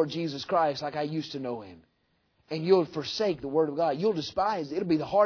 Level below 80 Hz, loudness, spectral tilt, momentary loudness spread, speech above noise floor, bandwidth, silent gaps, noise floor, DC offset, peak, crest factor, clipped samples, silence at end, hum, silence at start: -64 dBFS; -29 LUFS; -6 dB/octave; 10 LU; 44 dB; 5.4 kHz; none; -72 dBFS; under 0.1%; -10 dBFS; 18 dB; under 0.1%; 0 s; none; 0 s